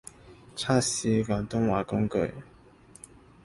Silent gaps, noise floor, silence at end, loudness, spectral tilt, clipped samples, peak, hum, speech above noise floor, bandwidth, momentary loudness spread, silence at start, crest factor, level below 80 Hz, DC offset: none; -54 dBFS; 1 s; -28 LUFS; -5 dB/octave; under 0.1%; -10 dBFS; none; 27 dB; 11.5 kHz; 23 LU; 0.25 s; 18 dB; -52 dBFS; under 0.1%